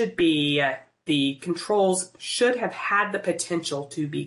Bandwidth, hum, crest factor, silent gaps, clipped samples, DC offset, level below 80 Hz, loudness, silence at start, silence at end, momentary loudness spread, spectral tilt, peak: 11.5 kHz; none; 14 dB; none; under 0.1%; under 0.1%; -68 dBFS; -24 LUFS; 0 s; 0 s; 8 LU; -4 dB/octave; -10 dBFS